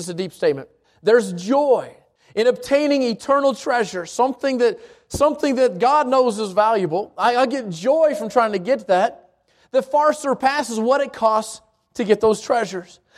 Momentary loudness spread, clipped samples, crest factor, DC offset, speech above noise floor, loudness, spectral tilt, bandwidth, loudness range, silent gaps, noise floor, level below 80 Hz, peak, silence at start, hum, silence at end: 8 LU; under 0.1%; 16 dB; under 0.1%; 39 dB; -19 LUFS; -4.5 dB/octave; 14.5 kHz; 2 LU; none; -57 dBFS; -56 dBFS; -2 dBFS; 0 s; none; 0.35 s